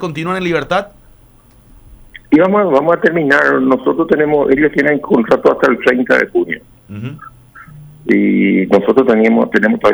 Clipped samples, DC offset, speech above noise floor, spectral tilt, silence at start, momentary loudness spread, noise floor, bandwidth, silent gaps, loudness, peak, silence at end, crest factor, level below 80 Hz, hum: under 0.1%; under 0.1%; 33 dB; -7 dB/octave; 0 s; 12 LU; -45 dBFS; over 20 kHz; none; -12 LUFS; 0 dBFS; 0 s; 12 dB; -46 dBFS; none